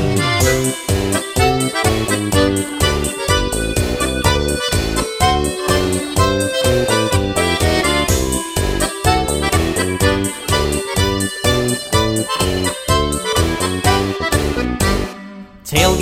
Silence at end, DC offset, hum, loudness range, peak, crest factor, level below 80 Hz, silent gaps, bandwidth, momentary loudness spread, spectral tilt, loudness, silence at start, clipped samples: 0 s; under 0.1%; none; 1 LU; 0 dBFS; 16 dB; -26 dBFS; none; 16.5 kHz; 4 LU; -4 dB/octave; -16 LUFS; 0 s; under 0.1%